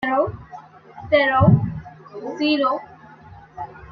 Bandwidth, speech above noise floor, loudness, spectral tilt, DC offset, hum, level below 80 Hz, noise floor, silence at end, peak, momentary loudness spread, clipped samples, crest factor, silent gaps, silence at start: 6.4 kHz; 27 dB; -19 LUFS; -8.5 dB/octave; under 0.1%; none; -46 dBFS; -44 dBFS; 0 s; -2 dBFS; 25 LU; under 0.1%; 20 dB; none; 0 s